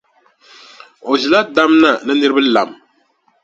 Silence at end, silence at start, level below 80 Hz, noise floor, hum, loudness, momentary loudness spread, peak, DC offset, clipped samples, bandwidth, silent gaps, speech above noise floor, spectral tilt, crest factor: 0.7 s; 1.05 s; -60 dBFS; -59 dBFS; none; -13 LUFS; 9 LU; 0 dBFS; under 0.1%; under 0.1%; 7.8 kHz; none; 46 dB; -4 dB/octave; 16 dB